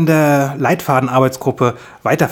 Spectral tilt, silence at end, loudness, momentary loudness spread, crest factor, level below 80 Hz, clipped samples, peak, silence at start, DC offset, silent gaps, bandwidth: -6.5 dB/octave; 0 s; -15 LUFS; 6 LU; 14 dB; -54 dBFS; under 0.1%; 0 dBFS; 0 s; under 0.1%; none; 19 kHz